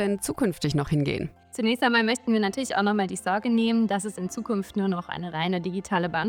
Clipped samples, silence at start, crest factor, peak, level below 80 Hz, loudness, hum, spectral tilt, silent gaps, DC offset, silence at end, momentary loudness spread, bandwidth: under 0.1%; 0 s; 18 dB; -6 dBFS; -54 dBFS; -26 LUFS; none; -5 dB/octave; none; under 0.1%; 0 s; 7 LU; 16.5 kHz